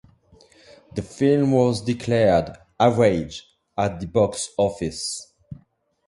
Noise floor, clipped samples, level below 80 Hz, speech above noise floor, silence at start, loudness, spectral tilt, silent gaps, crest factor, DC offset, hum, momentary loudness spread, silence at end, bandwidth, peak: -61 dBFS; under 0.1%; -48 dBFS; 40 dB; 0.95 s; -21 LUFS; -6 dB/octave; none; 20 dB; under 0.1%; none; 16 LU; 0.55 s; 11.5 kHz; -2 dBFS